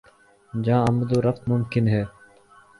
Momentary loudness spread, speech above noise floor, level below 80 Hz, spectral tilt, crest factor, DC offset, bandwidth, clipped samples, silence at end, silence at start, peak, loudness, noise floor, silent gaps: 9 LU; 32 dB; -50 dBFS; -8.5 dB/octave; 16 dB; under 0.1%; 11.5 kHz; under 0.1%; 0.7 s; 0.55 s; -8 dBFS; -23 LUFS; -53 dBFS; none